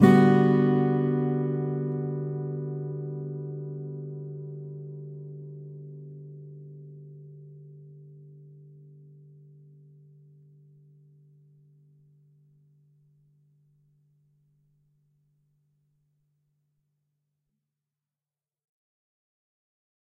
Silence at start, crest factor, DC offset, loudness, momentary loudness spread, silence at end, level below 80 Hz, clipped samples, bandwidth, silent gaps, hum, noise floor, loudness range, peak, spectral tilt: 0 s; 26 dB; under 0.1%; -27 LUFS; 27 LU; 11.55 s; -72 dBFS; under 0.1%; 8.2 kHz; none; none; under -90 dBFS; 26 LU; -4 dBFS; -9.5 dB/octave